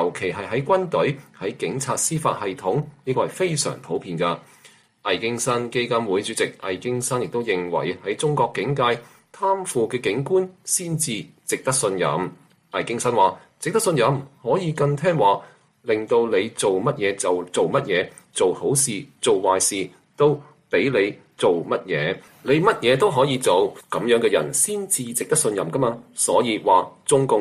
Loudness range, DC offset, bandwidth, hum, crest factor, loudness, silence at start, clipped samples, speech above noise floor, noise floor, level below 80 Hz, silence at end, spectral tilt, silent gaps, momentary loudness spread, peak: 4 LU; under 0.1%; 15.5 kHz; none; 18 dB; -22 LUFS; 0 s; under 0.1%; 31 dB; -52 dBFS; -62 dBFS; 0 s; -4 dB/octave; none; 8 LU; -4 dBFS